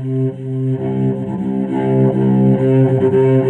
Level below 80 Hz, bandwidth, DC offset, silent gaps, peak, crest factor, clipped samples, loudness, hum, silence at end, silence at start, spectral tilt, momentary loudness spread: -52 dBFS; 3.4 kHz; under 0.1%; none; -2 dBFS; 12 dB; under 0.1%; -15 LUFS; none; 0 s; 0 s; -11 dB/octave; 8 LU